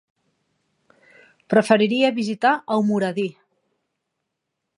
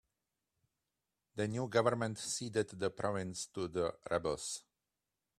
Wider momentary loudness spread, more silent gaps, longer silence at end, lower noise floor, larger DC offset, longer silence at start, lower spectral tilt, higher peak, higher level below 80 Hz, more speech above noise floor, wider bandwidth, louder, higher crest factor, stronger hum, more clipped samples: about the same, 8 LU vs 9 LU; neither; first, 1.45 s vs 0.8 s; second, -80 dBFS vs -90 dBFS; neither; first, 1.5 s vs 1.35 s; first, -6 dB/octave vs -4.5 dB/octave; first, -2 dBFS vs -16 dBFS; about the same, -74 dBFS vs -70 dBFS; first, 61 dB vs 53 dB; second, 11 kHz vs 13.5 kHz; first, -20 LUFS vs -37 LUFS; about the same, 22 dB vs 24 dB; neither; neither